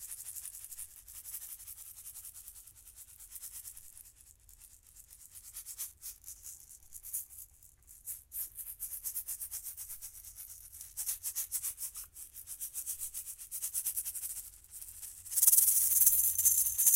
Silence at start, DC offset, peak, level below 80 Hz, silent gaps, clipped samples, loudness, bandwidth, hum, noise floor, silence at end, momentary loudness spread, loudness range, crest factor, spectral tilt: 0 s; under 0.1%; -8 dBFS; -66 dBFS; none; under 0.1%; -31 LUFS; 17 kHz; none; -60 dBFS; 0 s; 25 LU; 19 LU; 28 dB; 2.5 dB/octave